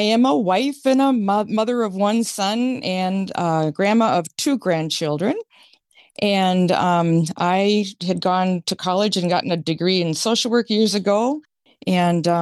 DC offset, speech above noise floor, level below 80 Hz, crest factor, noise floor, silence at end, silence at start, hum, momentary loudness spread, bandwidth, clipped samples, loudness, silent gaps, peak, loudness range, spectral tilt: under 0.1%; 35 dB; -68 dBFS; 12 dB; -54 dBFS; 0 s; 0 s; none; 5 LU; 12.5 kHz; under 0.1%; -19 LUFS; none; -6 dBFS; 2 LU; -5 dB/octave